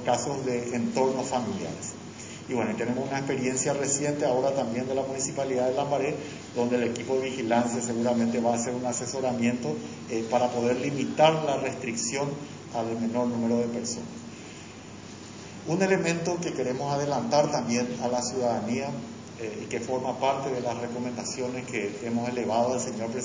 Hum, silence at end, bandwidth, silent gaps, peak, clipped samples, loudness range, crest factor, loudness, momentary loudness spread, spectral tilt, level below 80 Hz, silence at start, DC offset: none; 0 s; 7.8 kHz; none; -6 dBFS; under 0.1%; 4 LU; 22 dB; -28 LUFS; 11 LU; -4.5 dB/octave; -62 dBFS; 0 s; under 0.1%